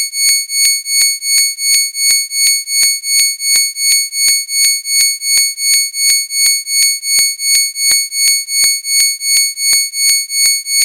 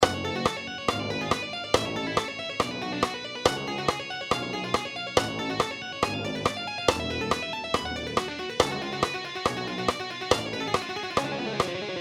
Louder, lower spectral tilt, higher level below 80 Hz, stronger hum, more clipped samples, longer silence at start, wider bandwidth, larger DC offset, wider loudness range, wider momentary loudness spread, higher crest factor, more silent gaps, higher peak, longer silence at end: first, -10 LUFS vs -28 LUFS; second, 6.5 dB/octave vs -3.5 dB/octave; second, -62 dBFS vs -52 dBFS; neither; neither; about the same, 0 s vs 0 s; second, 16 kHz vs 18 kHz; neither; about the same, 0 LU vs 1 LU; about the same, 1 LU vs 3 LU; second, 12 dB vs 26 dB; neither; first, 0 dBFS vs -4 dBFS; about the same, 0 s vs 0 s